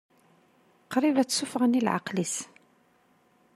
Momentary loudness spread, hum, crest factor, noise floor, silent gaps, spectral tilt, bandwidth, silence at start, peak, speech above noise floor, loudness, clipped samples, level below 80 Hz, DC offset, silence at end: 8 LU; none; 20 dB; -65 dBFS; none; -4 dB/octave; 14 kHz; 0.9 s; -10 dBFS; 39 dB; -27 LUFS; under 0.1%; -78 dBFS; under 0.1%; 1.1 s